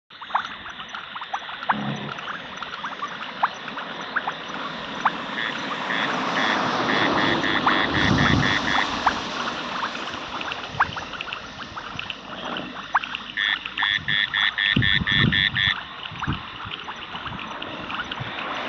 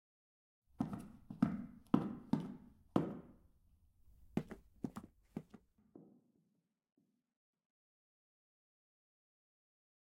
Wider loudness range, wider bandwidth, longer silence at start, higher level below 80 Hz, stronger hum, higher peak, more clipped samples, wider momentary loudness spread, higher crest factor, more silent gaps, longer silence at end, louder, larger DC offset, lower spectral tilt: second, 9 LU vs 14 LU; second, 8.4 kHz vs 14 kHz; second, 0.1 s vs 0.8 s; first, -48 dBFS vs -72 dBFS; neither; first, -6 dBFS vs -16 dBFS; neither; second, 13 LU vs 18 LU; second, 20 dB vs 30 dB; neither; second, 0 s vs 4.1 s; first, -24 LUFS vs -43 LUFS; neither; second, -4.5 dB/octave vs -8.5 dB/octave